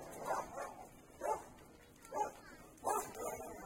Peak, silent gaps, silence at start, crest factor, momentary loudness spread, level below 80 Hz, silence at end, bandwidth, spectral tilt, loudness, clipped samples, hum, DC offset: -24 dBFS; none; 0 s; 20 dB; 18 LU; -68 dBFS; 0 s; 16.5 kHz; -3.5 dB/octave; -43 LUFS; under 0.1%; none; under 0.1%